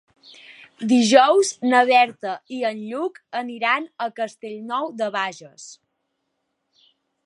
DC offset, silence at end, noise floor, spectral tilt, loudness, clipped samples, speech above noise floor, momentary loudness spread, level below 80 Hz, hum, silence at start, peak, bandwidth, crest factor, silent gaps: under 0.1%; 1.55 s; -75 dBFS; -3 dB/octave; -20 LUFS; under 0.1%; 55 dB; 16 LU; -80 dBFS; none; 0.5 s; -2 dBFS; 11.5 kHz; 22 dB; none